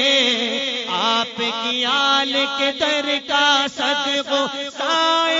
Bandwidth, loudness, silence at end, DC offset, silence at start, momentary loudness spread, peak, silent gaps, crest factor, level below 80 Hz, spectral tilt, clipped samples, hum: 7.8 kHz; -18 LUFS; 0 s; under 0.1%; 0 s; 6 LU; -4 dBFS; none; 16 dB; -68 dBFS; -1 dB/octave; under 0.1%; none